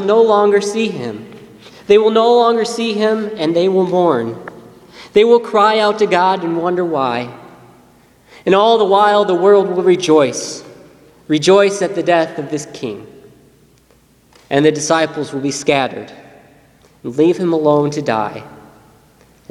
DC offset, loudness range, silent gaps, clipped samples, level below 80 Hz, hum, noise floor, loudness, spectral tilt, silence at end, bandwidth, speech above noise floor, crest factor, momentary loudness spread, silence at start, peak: under 0.1%; 5 LU; none; under 0.1%; -58 dBFS; none; -51 dBFS; -14 LUFS; -5 dB/octave; 0.95 s; 12 kHz; 38 dB; 16 dB; 15 LU; 0 s; 0 dBFS